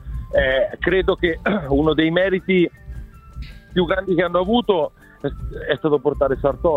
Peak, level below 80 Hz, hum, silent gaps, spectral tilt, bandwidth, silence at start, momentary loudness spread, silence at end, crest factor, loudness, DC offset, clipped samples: -4 dBFS; -34 dBFS; none; none; -8 dB/octave; 5.2 kHz; 0 s; 13 LU; 0 s; 16 dB; -20 LUFS; under 0.1%; under 0.1%